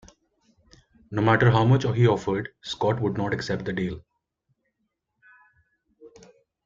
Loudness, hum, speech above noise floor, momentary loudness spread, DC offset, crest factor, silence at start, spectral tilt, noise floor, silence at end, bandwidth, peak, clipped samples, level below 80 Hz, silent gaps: -24 LUFS; none; 55 dB; 13 LU; under 0.1%; 22 dB; 1.1 s; -7 dB/octave; -78 dBFS; 0.55 s; 7.6 kHz; -4 dBFS; under 0.1%; -54 dBFS; none